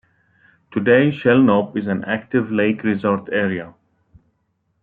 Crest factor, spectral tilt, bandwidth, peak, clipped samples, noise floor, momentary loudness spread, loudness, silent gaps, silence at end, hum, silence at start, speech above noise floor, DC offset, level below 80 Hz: 18 dB; -10 dB/octave; 4.2 kHz; -2 dBFS; under 0.1%; -68 dBFS; 9 LU; -18 LUFS; none; 1.1 s; none; 0.7 s; 51 dB; under 0.1%; -62 dBFS